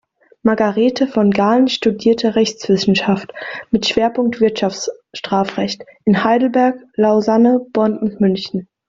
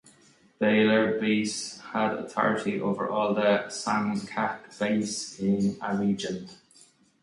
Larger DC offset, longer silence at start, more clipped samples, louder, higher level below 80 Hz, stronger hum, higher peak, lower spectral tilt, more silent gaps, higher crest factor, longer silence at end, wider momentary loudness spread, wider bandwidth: neither; second, 0.45 s vs 0.6 s; neither; first, -16 LUFS vs -27 LUFS; first, -54 dBFS vs -66 dBFS; neither; first, 0 dBFS vs -8 dBFS; about the same, -5.5 dB/octave vs -5 dB/octave; neither; about the same, 16 dB vs 18 dB; second, 0.25 s vs 0.7 s; about the same, 8 LU vs 9 LU; second, 7.6 kHz vs 11.5 kHz